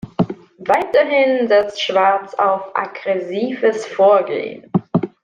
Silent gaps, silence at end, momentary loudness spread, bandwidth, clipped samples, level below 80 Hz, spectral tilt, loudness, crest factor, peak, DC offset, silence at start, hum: none; 0.15 s; 9 LU; 9.2 kHz; under 0.1%; -58 dBFS; -6 dB/octave; -17 LUFS; 14 dB; -2 dBFS; under 0.1%; 0.05 s; none